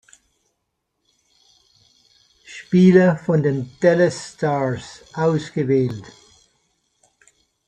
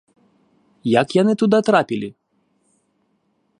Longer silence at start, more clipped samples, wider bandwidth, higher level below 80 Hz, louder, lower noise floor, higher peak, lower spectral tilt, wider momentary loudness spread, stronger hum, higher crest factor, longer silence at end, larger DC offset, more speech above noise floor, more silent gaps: first, 2.5 s vs 0.85 s; neither; second, 9.2 kHz vs 10.5 kHz; first, -60 dBFS vs -66 dBFS; about the same, -18 LUFS vs -18 LUFS; first, -75 dBFS vs -66 dBFS; about the same, -2 dBFS vs -2 dBFS; about the same, -7.5 dB/octave vs -6.5 dB/octave; first, 19 LU vs 12 LU; neither; about the same, 20 dB vs 20 dB; first, 1.65 s vs 1.5 s; neither; first, 57 dB vs 50 dB; neither